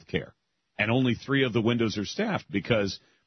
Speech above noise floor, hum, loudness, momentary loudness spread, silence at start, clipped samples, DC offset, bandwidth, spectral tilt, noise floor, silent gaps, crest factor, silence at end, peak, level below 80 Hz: 35 dB; none; -27 LUFS; 9 LU; 0.1 s; under 0.1%; under 0.1%; 6.4 kHz; -6 dB/octave; -62 dBFS; none; 18 dB; 0.3 s; -10 dBFS; -58 dBFS